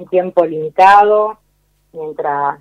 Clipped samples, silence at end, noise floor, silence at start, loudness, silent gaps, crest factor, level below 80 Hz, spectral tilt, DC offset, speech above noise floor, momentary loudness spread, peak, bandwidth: under 0.1%; 0.05 s; -59 dBFS; 0 s; -12 LUFS; none; 14 dB; -56 dBFS; -5.5 dB/octave; under 0.1%; 47 dB; 15 LU; 0 dBFS; 10.5 kHz